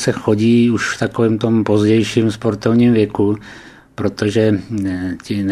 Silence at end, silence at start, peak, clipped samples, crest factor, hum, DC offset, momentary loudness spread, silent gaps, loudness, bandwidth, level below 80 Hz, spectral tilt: 0 s; 0 s; 0 dBFS; under 0.1%; 16 dB; none; under 0.1%; 10 LU; none; -16 LUFS; 11.5 kHz; -48 dBFS; -6.5 dB/octave